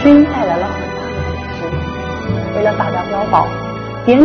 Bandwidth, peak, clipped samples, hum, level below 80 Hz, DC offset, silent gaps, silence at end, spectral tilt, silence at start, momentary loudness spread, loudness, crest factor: 6.4 kHz; 0 dBFS; 0.2%; none; -34 dBFS; under 0.1%; none; 0 s; -8 dB/octave; 0 s; 9 LU; -16 LUFS; 14 dB